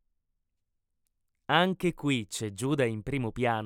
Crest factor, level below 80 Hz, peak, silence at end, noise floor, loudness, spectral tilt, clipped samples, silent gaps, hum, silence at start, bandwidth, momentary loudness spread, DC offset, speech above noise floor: 22 dB; -56 dBFS; -10 dBFS; 0 s; -80 dBFS; -29 LUFS; -5 dB/octave; under 0.1%; none; none; 1.5 s; 17 kHz; 8 LU; under 0.1%; 51 dB